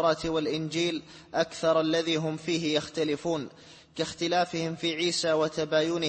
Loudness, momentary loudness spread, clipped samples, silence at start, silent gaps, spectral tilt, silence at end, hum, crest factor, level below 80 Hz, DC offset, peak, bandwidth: -28 LUFS; 8 LU; under 0.1%; 0 s; none; -4.5 dB/octave; 0 s; none; 16 dB; -62 dBFS; under 0.1%; -12 dBFS; 8.8 kHz